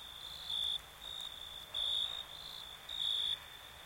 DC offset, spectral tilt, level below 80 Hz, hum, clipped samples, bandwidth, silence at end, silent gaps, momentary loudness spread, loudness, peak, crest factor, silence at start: under 0.1%; 0 dB/octave; -66 dBFS; none; under 0.1%; 16.5 kHz; 0 s; none; 12 LU; -38 LUFS; -26 dBFS; 16 dB; 0 s